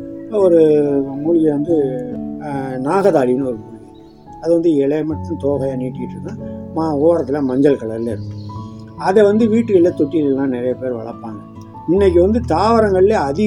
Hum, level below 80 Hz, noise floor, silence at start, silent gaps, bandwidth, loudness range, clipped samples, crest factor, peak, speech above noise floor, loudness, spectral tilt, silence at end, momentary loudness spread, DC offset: none; -44 dBFS; -40 dBFS; 0 s; none; 11.5 kHz; 3 LU; under 0.1%; 16 dB; 0 dBFS; 25 dB; -16 LUFS; -8 dB/octave; 0 s; 16 LU; under 0.1%